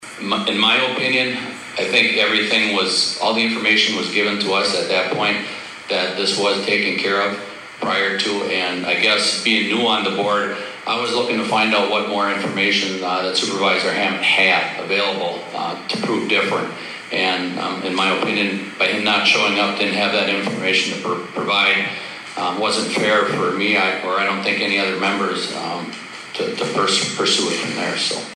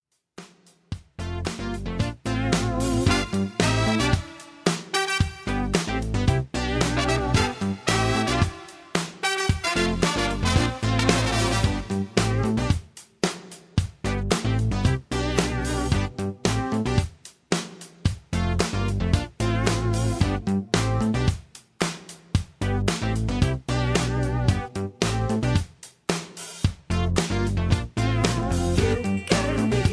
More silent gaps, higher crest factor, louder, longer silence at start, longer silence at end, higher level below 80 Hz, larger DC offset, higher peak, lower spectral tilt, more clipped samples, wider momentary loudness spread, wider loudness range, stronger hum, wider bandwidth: neither; about the same, 18 dB vs 22 dB; first, -18 LUFS vs -25 LUFS; second, 0 s vs 0.4 s; about the same, 0 s vs 0 s; second, -68 dBFS vs -34 dBFS; neither; about the same, 0 dBFS vs -2 dBFS; second, -2.5 dB/octave vs -5 dB/octave; neither; about the same, 9 LU vs 7 LU; about the same, 3 LU vs 3 LU; neither; first, 13.5 kHz vs 11 kHz